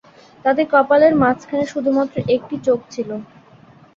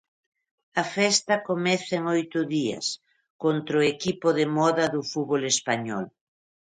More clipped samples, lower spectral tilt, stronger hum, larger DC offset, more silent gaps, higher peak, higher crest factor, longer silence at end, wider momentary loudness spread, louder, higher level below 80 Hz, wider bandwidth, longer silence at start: neither; first, -6.5 dB/octave vs -3.5 dB/octave; neither; neither; second, none vs 3.30-3.39 s; first, -2 dBFS vs -8 dBFS; about the same, 16 dB vs 18 dB; about the same, 0.7 s vs 0.65 s; first, 14 LU vs 8 LU; first, -17 LUFS vs -25 LUFS; first, -56 dBFS vs -70 dBFS; second, 7.6 kHz vs 10.5 kHz; second, 0.45 s vs 0.75 s